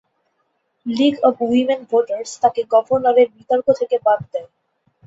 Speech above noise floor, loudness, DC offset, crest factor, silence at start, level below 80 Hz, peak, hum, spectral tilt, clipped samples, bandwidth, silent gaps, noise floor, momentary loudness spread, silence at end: 52 dB; -17 LUFS; under 0.1%; 18 dB; 0.85 s; -62 dBFS; 0 dBFS; none; -5 dB/octave; under 0.1%; 8 kHz; none; -69 dBFS; 10 LU; 0.6 s